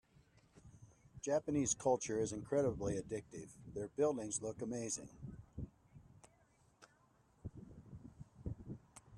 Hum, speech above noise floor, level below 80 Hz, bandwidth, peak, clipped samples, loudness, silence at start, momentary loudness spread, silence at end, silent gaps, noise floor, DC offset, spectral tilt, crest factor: none; 33 dB; -64 dBFS; 12 kHz; -22 dBFS; under 0.1%; -40 LUFS; 0.65 s; 20 LU; 0 s; none; -72 dBFS; under 0.1%; -5 dB/octave; 20 dB